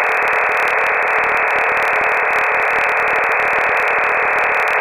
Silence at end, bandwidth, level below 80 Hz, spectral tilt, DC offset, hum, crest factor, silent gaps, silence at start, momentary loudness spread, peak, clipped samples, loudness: 0 s; 15.5 kHz; -52 dBFS; -2.5 dB/octave; under 0.1%; none; 14 dB; none; 0 s; 0 LU; -2 dBFS; under 0.1%; -14 LUFS